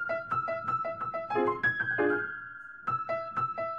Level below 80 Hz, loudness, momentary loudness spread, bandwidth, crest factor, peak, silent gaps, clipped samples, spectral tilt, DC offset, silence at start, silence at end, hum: -68 dBFS; -31 LUFS; 9 LU; 7.4 kHz; 14 dB; -16 dBFS; none; under 0.1%; -7.5 dB/octave; under 0.1%; 0 s; 0 s; none